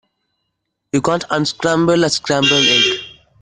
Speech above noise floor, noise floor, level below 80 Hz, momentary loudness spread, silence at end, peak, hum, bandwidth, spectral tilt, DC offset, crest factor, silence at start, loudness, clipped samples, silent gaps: 59 dB; -73 dBFS; -50 dBFS; 8 LU; 0.3 s; -2 dBFS; none; 10 kHz; -3.5 dB/octave; under 0.1%; 16 dB; 0.95 s; -14 LUFS; under 0.1%; none